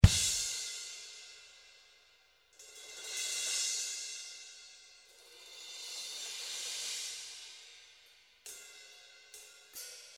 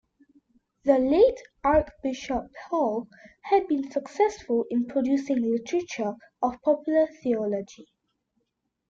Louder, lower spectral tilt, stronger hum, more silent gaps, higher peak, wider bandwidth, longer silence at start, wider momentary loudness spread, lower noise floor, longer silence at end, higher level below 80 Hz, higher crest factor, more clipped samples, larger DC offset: second, -37 LUFS vs -26 LUFS; second, -2.5 dB/octave vs -6 dB/octave; neither; neither; first, -4 dBFS vs -8 dBFS; first, 16.5 kHz vs 7.6 kHz; second, 0 s vs 0.85 s; first, 23 LU vs 10 LU; second, -67 dBFS vs -79 dBFS; second, 0 s vs 1.05 s; first, -44 dBFS vs -52 dBFS; first, 34 dB vs 18 dB; neither; neither